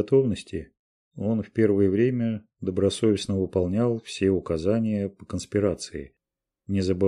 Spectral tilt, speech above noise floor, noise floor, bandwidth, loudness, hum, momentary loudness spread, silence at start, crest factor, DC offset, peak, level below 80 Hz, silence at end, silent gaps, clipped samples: -7 dB/octave; 62 dB; -86 dBFS; 11.5 kHz; -25 LUFS; none; 11 LU; 0 s; 16 dB; under 0.1%; -8 dBFS; -52 dBFS; 0 s; 0.79-1.11 s; under 0.1%